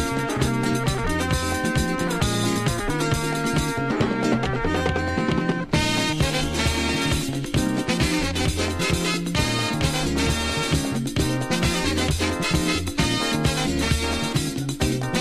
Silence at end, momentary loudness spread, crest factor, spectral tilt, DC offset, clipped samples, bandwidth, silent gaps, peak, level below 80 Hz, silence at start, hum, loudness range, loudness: 0 s; 2 LU; 16 dB; -4.5 dB/octave; under 0.1%; under 0.1%; 16 kHz; none; -6 dBFS; -34 dBFS; 0 s; none; 1 LU; -23 LUFS